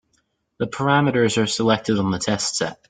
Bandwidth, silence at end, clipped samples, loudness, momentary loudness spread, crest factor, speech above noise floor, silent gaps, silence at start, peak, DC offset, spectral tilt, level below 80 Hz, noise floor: 9.6 kHz; 0.15 s; under 0.1%; -20 LUFS; 6 LU; 18 dB; 48 dB; none; 0.6 s; -2 dBFS; under 0.1%; -4.5 dB/octave; -54 dBFS; -68 dBFS